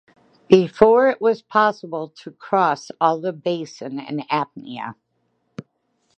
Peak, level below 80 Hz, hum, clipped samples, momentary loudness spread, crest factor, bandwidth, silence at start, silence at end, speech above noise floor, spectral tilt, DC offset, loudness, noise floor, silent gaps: 0 dBFS; -60 dBFS; none; under 0.1%; 20 LU; 20 dB; 8.4 kHz; 0.5 s; 0.55 s; 50 dB; -6.5 dB/octave; under 0.1%; -19 LUFS; -69 dBFS; none